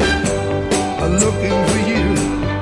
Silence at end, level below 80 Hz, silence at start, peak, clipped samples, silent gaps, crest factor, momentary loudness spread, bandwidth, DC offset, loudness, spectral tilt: 0 s; -30 dBFS; 0 s; -2 dBFS; under 0.1%; none; 16 dB; 3 LU; 12 kHz; under 0.1%; -17 LUFS; -4.5 dB/octave